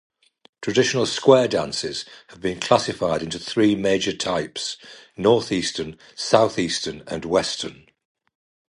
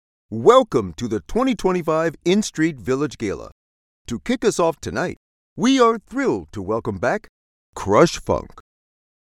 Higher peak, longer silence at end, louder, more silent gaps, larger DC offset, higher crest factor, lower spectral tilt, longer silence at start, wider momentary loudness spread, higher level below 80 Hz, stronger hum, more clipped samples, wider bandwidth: about the same, 0 dBFS vs 0 dBFS; first, 1.05 s vs 0.65 s; about the same, -22 LUFS vs -20 LUFS; second, none vs 3.52-4.05 s, 5.17-5.56 s, 7.29-7.73 s; neither; about the same, 22 dB vs 20 dB; second, -4 dB/octave vs -5.5 dB/octave; first, 0.6 s vs 0.3 s; about the same, 13 LU vs 12 LU; second, -54 dBFS vs -44 dBFS; neither; neither; second, 11.5 kHz vs 15 kHz